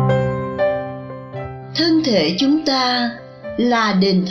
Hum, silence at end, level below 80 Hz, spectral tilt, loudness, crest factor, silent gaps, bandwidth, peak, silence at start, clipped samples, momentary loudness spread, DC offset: none; 0 s; -48 dBFS; -6 dB/octave; -17 LUFS; 14 dB; none; 7.4 kHz; -4 dBFS; 0 s; under 0.1%; 15 LU; under 0.1%